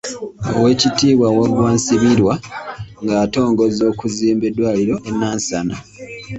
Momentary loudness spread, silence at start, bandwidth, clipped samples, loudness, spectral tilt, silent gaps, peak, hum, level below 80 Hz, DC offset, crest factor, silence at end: 14 LU; 0.05 s; 8.2 kHz; under 0.1%; -16 LUFS; -5 dB/octave; none; -2 dBFS; none; -44 dBFS; under 0.1%; 14 dB; 0 s